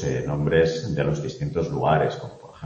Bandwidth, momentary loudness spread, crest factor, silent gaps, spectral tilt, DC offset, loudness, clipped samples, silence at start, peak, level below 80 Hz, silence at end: 7.4 kHz; 8 LU; 18 dB; none; -7 dB/octave; under 0.1%; -24 LUFS; under 0.1%; 0 s; -6 dBFS; -44 dBFS; 0 s